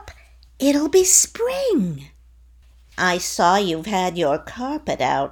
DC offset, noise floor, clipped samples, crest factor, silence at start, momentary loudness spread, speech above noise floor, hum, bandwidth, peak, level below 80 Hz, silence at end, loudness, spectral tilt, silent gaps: under 0.1%; -50 dBFS; under 0.1%; 20 dB; 0 s; 13 LU; 30 dB; none; over 20 kHz; 0 dBFS; -48 dBFS; 0 s; -19 LUFS; -3 dB/octave; none